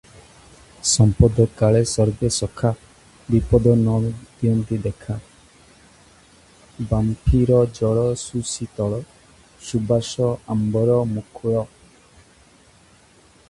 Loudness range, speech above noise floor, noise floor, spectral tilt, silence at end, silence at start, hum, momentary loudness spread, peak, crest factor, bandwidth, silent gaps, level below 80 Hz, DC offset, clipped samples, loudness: 6 LU; 33 dB; -52 dBFS; -6.5 dB/octave; 1.85 s; 0.85 s; none; 11 LU; 0 dBFS; 20 dB; 11.5 kHz; none; -34 dBFS; under 0.1%; under 0.1%; -20 LUFS